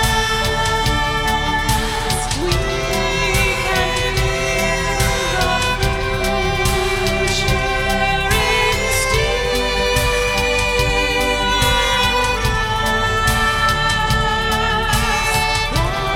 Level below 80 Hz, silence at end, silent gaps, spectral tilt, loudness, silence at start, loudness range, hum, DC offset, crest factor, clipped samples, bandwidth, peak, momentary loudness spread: -24 dBFS; 0 s; none; -3.5 dB/octave; -17 LUFS; 0 s; 2 LU; none; under 0.1%; 14 dB; under 0.1%; 17 kHz; -2 dBFS; 3 LU